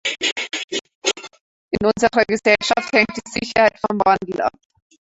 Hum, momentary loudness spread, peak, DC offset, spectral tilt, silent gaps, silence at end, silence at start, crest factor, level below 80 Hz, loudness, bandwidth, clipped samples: none; 9 LU; 0 dBFS; under 0.1%; -3 dB/octave; 0.32-0.36 s, 0.64-0.68 s, 0.95-1.02 s, 1.40-1.69 s; 0.65 s; 0.05 s; 20 dB; -50 dBFS; -19 LUFS; 8.4 kHz; under 0.1%